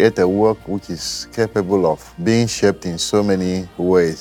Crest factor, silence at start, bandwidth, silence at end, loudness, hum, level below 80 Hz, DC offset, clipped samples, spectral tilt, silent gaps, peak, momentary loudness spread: 16 dB; 0 s; 17 kHz; 0 s; -18 LUFS; none; -48 dBFS; under 0.1%; under 0.1%; -5 dB/octave; none; 0 dBFS; 8 LU